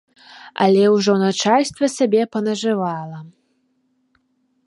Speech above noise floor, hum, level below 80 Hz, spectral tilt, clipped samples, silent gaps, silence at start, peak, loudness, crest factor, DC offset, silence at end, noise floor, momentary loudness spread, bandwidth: 48 dB; none; -66 dBFS; -5 dB/octave; under 0.1%; none; 0.3 s; -2 dBFS; -18 LUFS; 18 dB; under 0.1%; 1.35 s; -66 dBFS; 16 LU; 11.5 kHz